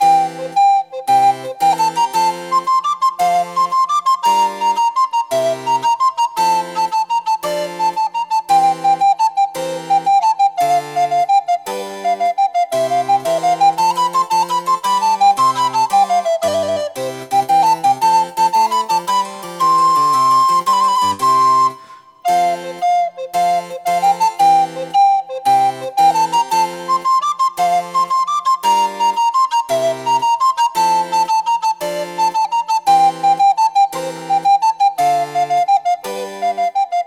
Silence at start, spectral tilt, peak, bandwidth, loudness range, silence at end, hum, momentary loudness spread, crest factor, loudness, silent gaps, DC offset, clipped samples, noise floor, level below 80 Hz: 0 s; -2.5 dB/octave; -4 dBFS; 16.5 kHz; 2 LU; 0 s; none; 6 LU; 12 dB; -15 LUFS; none; under 0.1%; under 0.1%; -40 dBFS; -70 dBFS